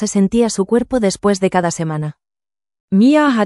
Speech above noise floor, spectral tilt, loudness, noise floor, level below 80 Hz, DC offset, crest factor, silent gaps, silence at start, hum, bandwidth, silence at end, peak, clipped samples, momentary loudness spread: over 76 dB; -5.5 dB/octave; -15 LUFS; under -90 dBFS; -46 dBFS; under 0.1%; 14 dB; 2.80-2.88 s; 0 s; none; 12 kHz; 0 s; -2 dBFS; under 0.1%; 10 LU